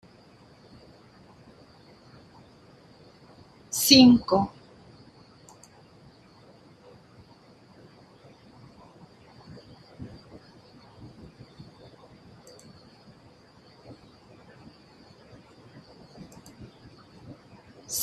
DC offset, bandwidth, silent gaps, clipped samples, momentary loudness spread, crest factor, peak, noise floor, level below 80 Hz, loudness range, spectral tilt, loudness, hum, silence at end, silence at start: under 0.1%; 13.5 kHz; none; under 0.1%; 33 LU; 30 dB; 0 dBFS; -55 dBFS; -62 dBFS; 27 LU; -3.5 dB/octave; -19 LUFS; none; 0 s; 3.75 s